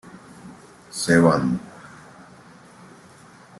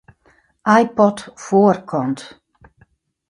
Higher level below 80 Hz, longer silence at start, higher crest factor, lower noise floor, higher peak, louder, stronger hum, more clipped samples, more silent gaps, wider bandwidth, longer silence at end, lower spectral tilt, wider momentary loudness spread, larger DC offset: about the same, -58 dBFS vs -60 dBFS; second, 0.45 s vs 0.65 s; about the same, 22 dB vs 18 dB; second, -48 dBFS vs -57 dBFS; second, -4 dBFS vs 0 dBFS; second, -20 LUFS vs -17 LUFS; neither; neither; neither; first, 12.5 kHz vs 11 kHz; first, 1.75 s vs 1.05 s; about the same, -5.5 dB/octave vs -6.5 dB/octave; first, 28 LU vs 12 LU; neither